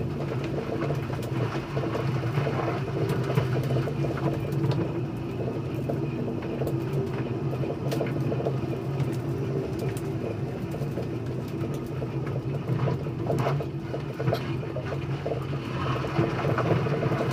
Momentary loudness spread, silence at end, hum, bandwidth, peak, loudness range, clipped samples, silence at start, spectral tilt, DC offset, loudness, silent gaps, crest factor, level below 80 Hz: 5 LU; 0 s; none; 15.5 kHz; -12 dBFS; 3 LU; under 0.1%; 0 s; -8 dB/octave; under 0.1%; -29 LUFS; none; 16 dB; -50 dBFS